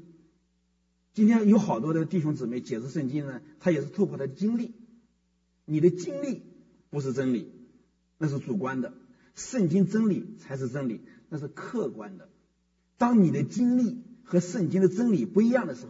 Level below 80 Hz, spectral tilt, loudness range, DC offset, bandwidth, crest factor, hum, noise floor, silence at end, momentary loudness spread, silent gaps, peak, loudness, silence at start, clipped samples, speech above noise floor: -72 dBFS; -7.5 dB/octave; 5 LU; under 0.1%; 7.8 kHz; 18 dB; none; -71 dBFS; 0 s; 16 LU; none; -10 dBFS; -27 LUFS; 1.15 s; under 0.1%; 45 dB